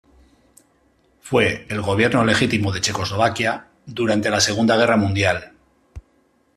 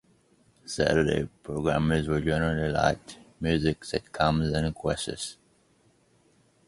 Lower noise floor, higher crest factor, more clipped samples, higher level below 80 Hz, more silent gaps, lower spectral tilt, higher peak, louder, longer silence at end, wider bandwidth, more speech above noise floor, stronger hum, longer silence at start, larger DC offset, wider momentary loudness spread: about the same, -61 dBFS vs -64 dBFS; about the same, 18 dB vs 22 dB; neither; second, -50 dBFS vs -44 dBFS; neither; about the same, -4.5 dB/octave vs -5.5 dB/octave; first, -2 dBFS vs -6 dBFS; first, -19 LUFS vs -28 LUFS; second, 0.55 s vs 1.35 s; first, 14 kHz vs 11.5 kHz; first, 42 dB vs 38 dB; neither; first, 1.25 s vs 0.65 s; neither; second, 8 LU vs 12 LU